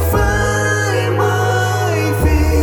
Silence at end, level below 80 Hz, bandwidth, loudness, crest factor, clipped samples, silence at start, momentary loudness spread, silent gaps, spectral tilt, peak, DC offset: 0 s; -22 dBFS; over 20 kHz; -15 LUFS; 10 dB; under 0.1%; 0 s; 2 LU; none; -5.5 dB/octave; -4 dBFS; under 0.1%